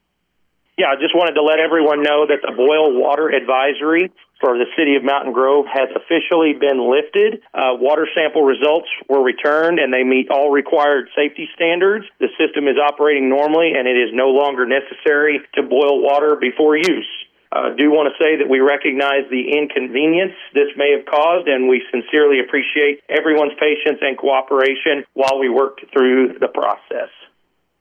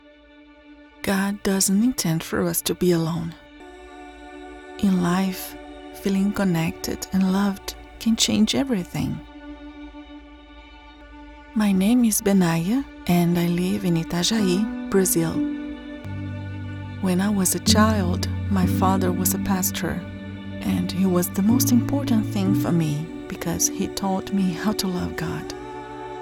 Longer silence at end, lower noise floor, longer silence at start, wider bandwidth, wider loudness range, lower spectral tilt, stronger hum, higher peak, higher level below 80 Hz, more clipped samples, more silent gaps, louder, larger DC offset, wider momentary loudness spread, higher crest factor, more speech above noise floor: first, 0.75 s vs 0 s; first, -67 dBFS vs -49 dBFS; about the same, 0.8 s vs 0.7 s; second, 8.4 kHz vs 18.5 kHz; second, 1 LU vs 4 LU; about the same, -4.5 dB/octave vs -5 dB/octave; neither; about the same, -4 dBFS vs -2 dBFS; second, -74 dBFS vs -46 dBFS; neither; neither; first, -15 LUFS vs -22 LUFS; neither; second, 5 LU vs 16 LU; second, 10 dB vs 22 dB; first, 52 dB vs 28 dB